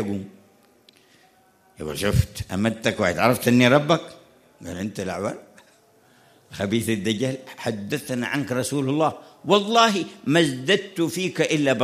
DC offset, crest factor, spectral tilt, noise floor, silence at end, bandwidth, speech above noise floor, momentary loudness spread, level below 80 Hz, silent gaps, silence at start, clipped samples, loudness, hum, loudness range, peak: under 0.1%; 22 dB; -5 dB/octave; -58 dBFS; 0 s; 15.5 kHz; 36 dB; 15 LU; -46 dBFS; none; 0 s; under 0.1%; -22 LUFS; none; 7 LU; -2 dBFS